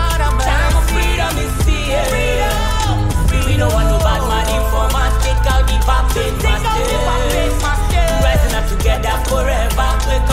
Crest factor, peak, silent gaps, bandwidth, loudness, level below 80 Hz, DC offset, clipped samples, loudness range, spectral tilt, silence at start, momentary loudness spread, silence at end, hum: 12 dB; -2 dBFS; none; 16 kHz; -16 LUFS; -16 dBFS; under 0.1%; under 0.1%; 1 LU; -4.5 dB/octave; 0 s; 2 LU; 0 s; none